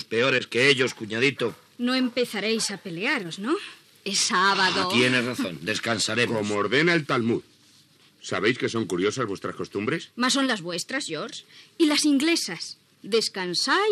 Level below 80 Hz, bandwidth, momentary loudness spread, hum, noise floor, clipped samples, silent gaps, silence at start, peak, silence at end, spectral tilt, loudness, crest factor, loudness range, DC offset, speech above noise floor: -74 dBFS; 14 kHz; 11 LU; none; -57 dBFS; under 0.1%; none; 0 s; -6 dBFS; 0 s; -3 dB/octave; -24 LUFS; 20 dB; 4 LU; under 0.1%; 33 dB